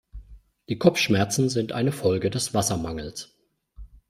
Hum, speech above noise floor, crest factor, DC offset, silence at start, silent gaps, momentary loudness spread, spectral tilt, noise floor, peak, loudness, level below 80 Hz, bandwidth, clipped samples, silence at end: none; 25 dB; 22 dB; under 0.1%; 0.15 s; none; 13 LU; -4.5 dB/octave; -49 dBFS; -2 dBFS; -24 LUFS; -48 dBFS; 16 kHz; under 0.1%; 0.25 s